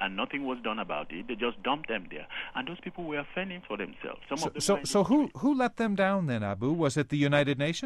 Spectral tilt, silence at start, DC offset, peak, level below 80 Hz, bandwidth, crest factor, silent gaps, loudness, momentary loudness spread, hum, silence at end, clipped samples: -5 dB/octave; 0 s; under 0.1%; -12 dBFS; -58 dBFS; 13 kHz; 18 dB; none; -30 LUFS; 11 LU; none; 0 s; under 0.1%